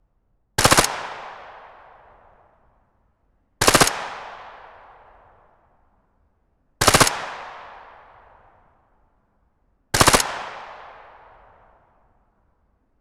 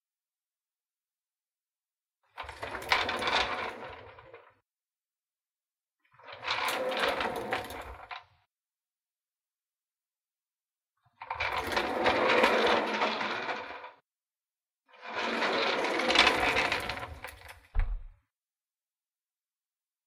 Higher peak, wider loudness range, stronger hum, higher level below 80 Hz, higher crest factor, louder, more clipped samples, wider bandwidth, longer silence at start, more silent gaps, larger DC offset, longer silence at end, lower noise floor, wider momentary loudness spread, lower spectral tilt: first, 0 dBFS vs -6 dBFS; second, 1 LU vs 12 LU; neither; first, -42 dBFS vs -48 dBFS; about the same, 26 dB vs 28 dB; first, -18 LUFS vs -29 LUFS; neither; first, 18 kHz vs 16 kHz; second, 0.6 s vs 2.35 s; neither; neither; first, 2.1 s vs 1.95 s; second, -66 dBFS vs under -90 dBFS; first, 26 LU vs 21 LU; about the same, -2 dB/octave vs -3 dB/octave